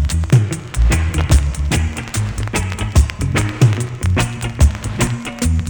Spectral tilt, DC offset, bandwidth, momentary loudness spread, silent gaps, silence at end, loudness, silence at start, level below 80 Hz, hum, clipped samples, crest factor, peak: -5.5 dB/octave; under 0.1%; over 20 kHz; 6 LU; none; 0 s; -17 LUFS; 0 s; -20 dBFS; none; under 0.1%; 14 dB; -2 dBFS